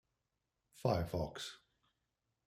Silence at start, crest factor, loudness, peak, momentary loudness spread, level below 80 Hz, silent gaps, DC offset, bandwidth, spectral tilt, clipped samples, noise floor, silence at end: 0.75 s; 24 dB; -40 LUFS; -20 dBFS; 12 LU; -62 dBFS; none; under 0.1%; 16 kHz; -6 dB/octave; under 0.1%; -87 dBFS; 0.9 s